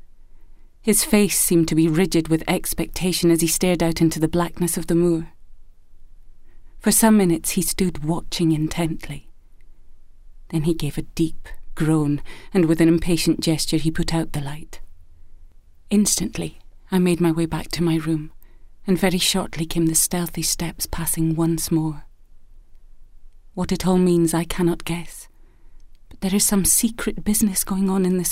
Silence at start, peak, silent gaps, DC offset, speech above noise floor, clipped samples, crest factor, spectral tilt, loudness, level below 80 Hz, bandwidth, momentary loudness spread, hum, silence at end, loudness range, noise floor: 0.05 s; -2 dBFS; none; under 0.1%; 24 dB; under 0.1%; 20 dB; -4.5 dB/octave; -20 LUFS; -36 dBFS; 16 kHz; 12 LU; none; 0 s; 6 LU; -44 dBFS